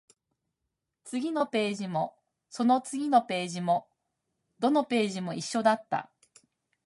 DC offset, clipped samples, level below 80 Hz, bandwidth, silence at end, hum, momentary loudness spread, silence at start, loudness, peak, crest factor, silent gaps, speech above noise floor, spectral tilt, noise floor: under 0.1%; under 0.1%; -80 dBFS; 11.5 kHz; 0.8 s; none; 9 LU; 1.05 s; -29 LUFS; -10 dBFS; 20 dB; none; 57 dB; -5 dB/octave; -84 dBFS